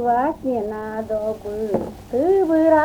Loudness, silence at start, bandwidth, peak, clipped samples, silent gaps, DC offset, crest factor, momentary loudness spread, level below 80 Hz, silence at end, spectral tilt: -21 LUFS; 0 s; 19.5 kHz; -6 dBFS; under 0.1%; none; under 0.1%; 14 dB; 10 LU; -48 dBFS; 0 s; -7.5 dB/octave